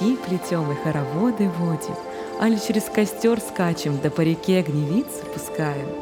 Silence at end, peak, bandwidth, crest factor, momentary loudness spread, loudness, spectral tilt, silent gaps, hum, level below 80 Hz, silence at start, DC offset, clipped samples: 0 s; -6 dBFS; 18.5 kHz; 16 dB; 8 LU; -23 LUFS; -6 dB/octave; none; none; -56 dBFS; 0 s; under 0.1%; under 0.1%